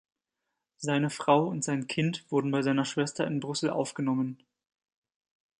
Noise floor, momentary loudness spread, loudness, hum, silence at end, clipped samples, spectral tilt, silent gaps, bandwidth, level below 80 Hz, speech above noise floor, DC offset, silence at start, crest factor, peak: -85 dBFS; 6 LU; -29 LUFS; none; 1.25 s; under 0.1%; -5.5 dB/octave; none; 11 kHz; -74 dBFS; 56 dB; under 0.1%; 0.8 s; 20 dB; -10 dBFS